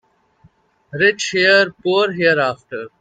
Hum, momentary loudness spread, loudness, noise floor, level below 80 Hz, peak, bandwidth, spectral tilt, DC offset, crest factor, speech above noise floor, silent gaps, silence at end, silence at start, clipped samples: none; 16 LU; -15 LUFS; -54 dBFS; -62 dBFS; 0 dBFS; 9.2 kHz; -3.5 dB/octave; under 0.1%; 18 dB; 38 dB; none; 0.1 s; 0.95 s; under 0.1%